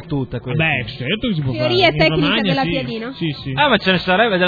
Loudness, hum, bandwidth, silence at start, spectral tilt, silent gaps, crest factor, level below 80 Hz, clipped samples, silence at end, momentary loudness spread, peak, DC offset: -17 LUFS; none; 5 kHz; 0 s; -7.5 dB/octave; none; 18 dB; -42 dBFS; under 0.1%; 0 s; 10 LU; 0 dBFS; under 0.1%